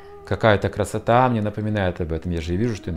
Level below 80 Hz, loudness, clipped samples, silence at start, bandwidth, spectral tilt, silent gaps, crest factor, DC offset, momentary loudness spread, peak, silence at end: -42 dBFS; -22 LUFS; under 0.1%; 0 s; 14 kHz; -7 dB/octave; none; 18 dB; under 0.1%; 8 LU; -2 dBFS; 0 s